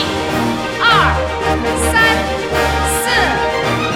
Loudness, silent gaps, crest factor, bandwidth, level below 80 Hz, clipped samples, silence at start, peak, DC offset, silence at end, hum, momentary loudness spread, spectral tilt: -14 LUFS; none; 14 dB; 17.5 kHz; -28 dBFS; under 0.1%; 0 s; -2 dBFS; under 0.1%; 0 s; none; 6 LU; -3.5 dB/octave